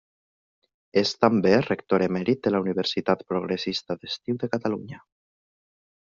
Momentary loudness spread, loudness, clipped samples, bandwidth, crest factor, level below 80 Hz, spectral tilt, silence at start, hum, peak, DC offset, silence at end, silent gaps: 10 LU; -25 LUFS; under 0.1%; 7.4 kHz; 22 dB; -62 dBFS; -4.5 dB/octave; 0.95 s; none; -4 dBFS; under 0.1%; 1.1 s; none